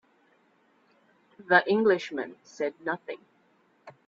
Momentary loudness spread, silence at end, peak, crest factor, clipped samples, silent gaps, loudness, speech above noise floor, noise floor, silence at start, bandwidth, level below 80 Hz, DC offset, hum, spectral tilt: 18 LU; 0.15 s; -4 dBFS; 26 dB; under 0.1%; none; -26 LUFS; 39 dB; -66 dBFS; 1.4 s; 7.6 kHz; -80 dBFS; under 0.1%; none; -5.5 dB/octave